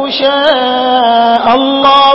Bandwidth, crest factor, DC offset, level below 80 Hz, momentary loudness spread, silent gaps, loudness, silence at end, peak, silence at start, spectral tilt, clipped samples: 8 kHz; 8 dB; under 0.1%; -46 dBFS; 3 LU; none; -9 LUFS; 0 s; 0 dBFS; 0 s; -5 dB/octave; 0.4%